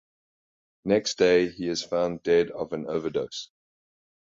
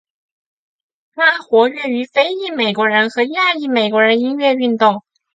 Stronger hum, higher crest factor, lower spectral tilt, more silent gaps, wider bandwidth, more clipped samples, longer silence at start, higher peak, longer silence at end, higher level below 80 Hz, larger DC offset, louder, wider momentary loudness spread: neither; about the same, 18 dB vs 16 dB; about the same, -4.5 dB/octave vs -5 dB/octave; neither; about the same, 7.8 kHz vs 7.8 kHz; neither; second, 0.85 s vs 1.15 s; second, -8 dBFS vs 0 dBFS; first, 0.75 s vs 0.35 s; first, -60 dBFS vs -70 dBFS; neither; second, -26 LUFS vs -15 LUFS; first, 14 LU vs 5 LU